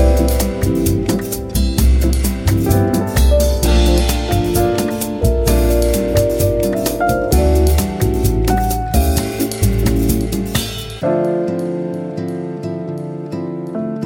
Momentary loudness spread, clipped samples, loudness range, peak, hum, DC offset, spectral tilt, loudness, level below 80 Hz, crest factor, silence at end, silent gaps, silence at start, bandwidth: 10 LU; under 0.1%; 5 LU; 0 dBFS; none; under 0.1%; -6 dB/octave; -16 LUFS; -18 dBFS; 14 dB; 0 s; none; 0 s; 17 kHz